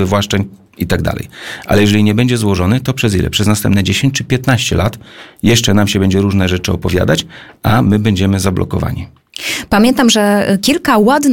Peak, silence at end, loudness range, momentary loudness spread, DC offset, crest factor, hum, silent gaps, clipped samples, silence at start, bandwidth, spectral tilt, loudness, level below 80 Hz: 0 dBFS; 0 s; 2 LU; 10 LU; 0.8%; 12 dB; none; none; under 0.1%; 0 s; 17 kHz; -5 dB/octave; -13 LUFS; -34 dBFS